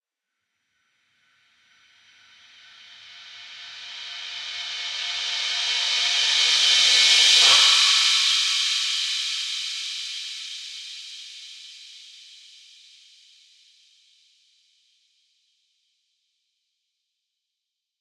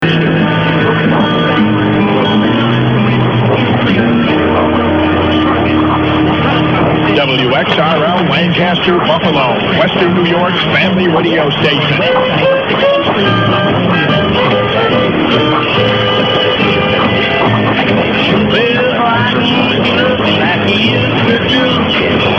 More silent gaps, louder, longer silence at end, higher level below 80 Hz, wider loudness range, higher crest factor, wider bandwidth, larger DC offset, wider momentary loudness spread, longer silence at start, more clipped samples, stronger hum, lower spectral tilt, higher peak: neither; second, -18 LUFS vs -10 LUFS; first, 5.8 s vs 0 s; second, -80 dBFS vs -38 dBFS; first, 23 LU vs 0 LU; first, 22 dB vs 10 dB; first, 16 kHz vs 6.8 kHz; neither; first, 25 LU vs 1 LU; first, 3.05 s vs 0 s; neither; neither; second, 4.5 dB/octave vs -7.5 dB/octave; about the same, -2 dBFS vs 0 dBFS